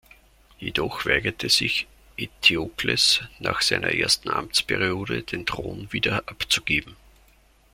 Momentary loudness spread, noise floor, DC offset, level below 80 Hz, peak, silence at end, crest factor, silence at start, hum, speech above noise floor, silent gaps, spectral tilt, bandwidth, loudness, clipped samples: 10 LU; -57 dBFS; under 0.1%; -50 dBFS; -2 dBFS; 0.8 s; 22 dB; 0.6 s; none; 33 dB; none; -2.5 dB/octave; 16.5 kHz; -22 LUFS; under 0.1%